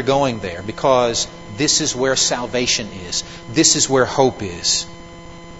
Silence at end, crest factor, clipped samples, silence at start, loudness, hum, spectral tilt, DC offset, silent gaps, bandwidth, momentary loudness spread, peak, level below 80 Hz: 0 s; 18 dB; under 0.1%; 0 s; -17 LUFS; none; -2.5 dB/octave; 0.6%; none; 11 kHz; 12 LU; 0 dBFS; -46 dBFS